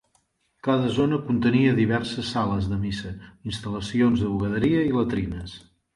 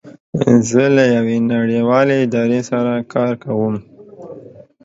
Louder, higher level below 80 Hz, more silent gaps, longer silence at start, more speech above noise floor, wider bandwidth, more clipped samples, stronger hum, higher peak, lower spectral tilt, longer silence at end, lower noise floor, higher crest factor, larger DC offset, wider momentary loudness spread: second, -24 LUFS vs -15 LUFS; first, -44 dBFS vs -56 dBFS; second, none vs 0.20-0.33 s; first, 0.65 s vs 0.05 s; first, 45 dB vs 24 dB; first, 11.5 kHz vs 8 kHz; neither; neither; second, -8 dBFS vs 0 dBFS; about the same, -7 dB/octave vs -6.5 dB/octave; first, 0.4 s vs 0.25 s; first, -68 dBFS vs -39 dBFS; about the same, 16 dB vs 16 dB; neither; about the same, 13 LU vs 14 LU